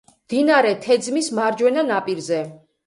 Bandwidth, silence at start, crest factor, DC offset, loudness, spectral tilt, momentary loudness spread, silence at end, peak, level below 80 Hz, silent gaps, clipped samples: 11.5 kHz; 0.3 s; 16 dB; under 0.1%; -19 LUFS; -4 dB/octave; 9 LU; 0.3 s; -4 dBFS; -68 dBFS; none; under 0.1%